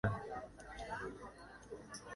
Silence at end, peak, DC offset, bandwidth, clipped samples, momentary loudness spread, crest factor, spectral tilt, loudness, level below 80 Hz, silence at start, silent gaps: 0 s; -20 dBFS; under 0.1%; 11.5 kHz; under 0.1%; 9 LU; 24 dB; -5.5 dB/octave; -48 LUFS; -60 dBFS; 0.05 s; none